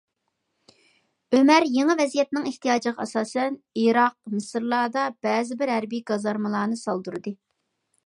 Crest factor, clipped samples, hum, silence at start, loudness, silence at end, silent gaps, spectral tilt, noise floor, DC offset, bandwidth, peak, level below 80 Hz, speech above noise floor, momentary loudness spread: 18 dB; under 0.1%; none; 1.3 s; -24 LUFS; 0.7 s; none; -4.5 dB/octave; -77 dBFS; under 0.1%; 11.5 kHz; -6 dBFS; -78 dBFS; 54 dB; 11 LU